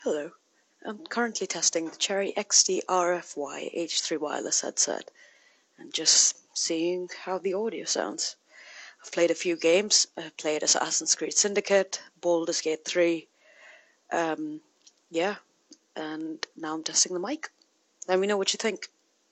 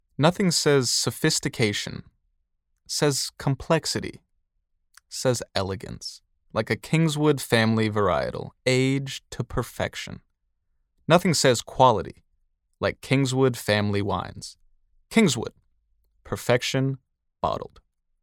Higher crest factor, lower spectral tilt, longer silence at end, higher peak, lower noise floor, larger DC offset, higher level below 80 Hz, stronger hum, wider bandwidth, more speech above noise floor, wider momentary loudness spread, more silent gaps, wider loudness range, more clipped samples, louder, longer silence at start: about the same, 24 dB vs 22 dB; second, -1 dB/octave vs -4.5 dB/octave; about the same, 0.45 s vs 0.55 s; about the same, -4 dBFS vs -4 dBFS; second, -61 dBFS vs -73 dBFS; neither; second, -78 dBFS vs -52 dBFS; neither; second, 9 kHz vs 17 kHz; second, 34 dB vs 50 dB; about the same, 16 LU vs 16 LU; neither; about the same, 6 LU vs 5 LU; neither; about the same, -26 LUFS vs -24 LUFS; second, 0 s vs 0.2 s